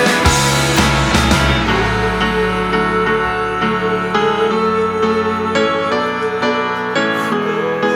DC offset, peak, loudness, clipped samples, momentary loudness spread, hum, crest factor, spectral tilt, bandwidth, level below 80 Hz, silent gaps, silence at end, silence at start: under 0.1%; 0 dBFS; -15 LUFS; under 0.1%; 4 LU; none; 14 dB; -4.5 dB/octave; over 20 kHz; -28 dBFS; none; 0 s; 0 s